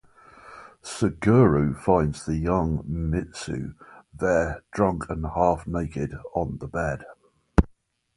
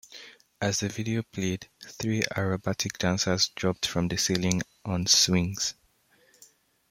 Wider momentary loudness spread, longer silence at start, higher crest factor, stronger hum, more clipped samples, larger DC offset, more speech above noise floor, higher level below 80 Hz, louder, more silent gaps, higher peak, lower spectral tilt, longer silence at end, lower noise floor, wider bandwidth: first, 14 LU vs 11 LU; first, 0.45 s vs 0.1 s; about the same, 24 dB vs 22 dB; neither; neither; neither; about the same, 36 dB vs 37 dB; first, -38 dBFS vs -58 dBFS; about the same, -25 LUFS vs -27 LUFS; neither; first, 0 dBFS vs -6 dBFS; first, -7.5 dB/octave vs -3.5 dB/octave; second, 0.5 s vs 1.2 s; second, -60 dBFS vs -64 dBFS; second, 11.5 kHz vs 16.5 kHz